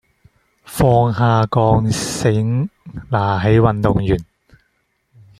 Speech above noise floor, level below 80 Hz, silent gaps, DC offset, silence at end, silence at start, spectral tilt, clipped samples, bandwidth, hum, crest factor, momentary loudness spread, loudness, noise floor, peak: 51 dB; -36 dBFS; none; under 0.1%; 1.15 s; 0.7 s; -6.5 dB/octave; under 0.1%; 15 kHz; none; 16 dB; 8 LU; -16 LUFS; -66 dBFS; -2 dBFS